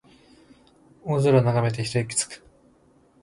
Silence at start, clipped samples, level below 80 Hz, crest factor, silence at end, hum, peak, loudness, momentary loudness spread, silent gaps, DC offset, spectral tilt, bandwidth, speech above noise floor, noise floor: 1.05 s; under 0.1%; -58 dBFS; 20 dB; 0.85 s; none; -6 dBFS; -23 LUFS; 16 LU; none; under 0.1%; -5.5 dB/octave; 11.5 kHz; 37 dB; -59 dBFS